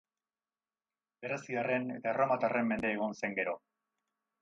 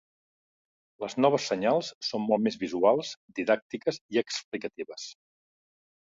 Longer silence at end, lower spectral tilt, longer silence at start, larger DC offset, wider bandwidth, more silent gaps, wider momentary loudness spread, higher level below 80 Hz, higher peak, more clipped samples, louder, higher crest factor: about the same, 0.85 s vs 0.9 s; first, -6.5 dB/octave vs -4.5 dB/octave; first, 1.2 s vs 1 s; neither; about the same, 8 kHz vs 7.8 kHz; second, none vs 1.95-2.01 s, 3.17-3.28 s, 3.62-3.70 s, 4.01-4.09 s, 4.44-4.52 s; second, 9 LU vs 14 LU; about the same, -72 dBFS vs -74 dBFS; second, -18 dBFS vs -10 dBFS; neither; second, -34 LUFS vs -28 LUFS; about the same, 18 dB vs 20 dB